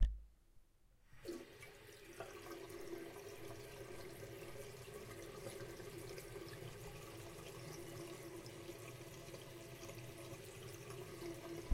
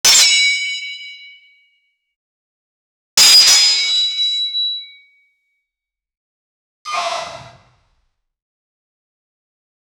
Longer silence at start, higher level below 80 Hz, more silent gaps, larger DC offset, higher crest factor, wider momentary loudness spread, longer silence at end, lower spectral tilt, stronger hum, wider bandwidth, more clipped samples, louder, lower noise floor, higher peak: about the same, 0 s vs 0.05 s; first, -54 dBFS vs -62 dBFS; second, none vs 2.16-3.17 s, 6.17-6.85 s; neither; first, 28 dB vs 18 dB; second, 3 LU vs 21 LU; second, 0 s vs 2.5 s; first, -5 dB/octave vs 3 dB/octave; neither; second, 16.5 kHz vs over 20 kHz; neither; second, -52 LUFS vs -11 LUFS; second, -70 dBFS vs -85 dBFS; second, -20 dBFS vs 0 dBFS